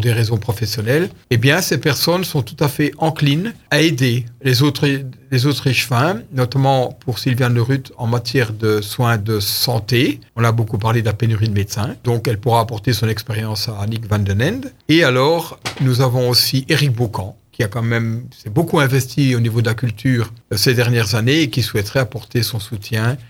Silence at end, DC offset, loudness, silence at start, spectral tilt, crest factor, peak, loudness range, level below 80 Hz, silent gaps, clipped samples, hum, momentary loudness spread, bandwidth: 0.05 s; under 0.1%; -17 LUFS; 0 s; -5.5 dB/octave; 16 dB; 0 dBFS; 2 LU; -48 dBFS; none; under 0.1%; none; 7 LU; 17 kHz